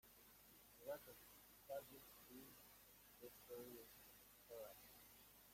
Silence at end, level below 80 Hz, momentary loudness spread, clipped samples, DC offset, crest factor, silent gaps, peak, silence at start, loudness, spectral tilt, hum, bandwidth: 0 s; -82 dBFS; 11 LU; under 0.1%; under 0.1%; 20 dB; none; -40 dBFS; 0.05 s; -60 LUFS; -3 dB/octave; none; 16.5 kHz